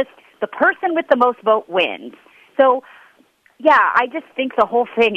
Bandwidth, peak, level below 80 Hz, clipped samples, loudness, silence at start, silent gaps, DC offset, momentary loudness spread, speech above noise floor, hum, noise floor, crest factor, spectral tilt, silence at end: 8.6 kHz; -2 dBFS; -64 dBFS; under 0.1%; -17 LUFS; 0 s; none; under 0.1%; 13 LU; 39 dB; none; -55 dBFS; 16 dB; -5 dB/octave; 0 s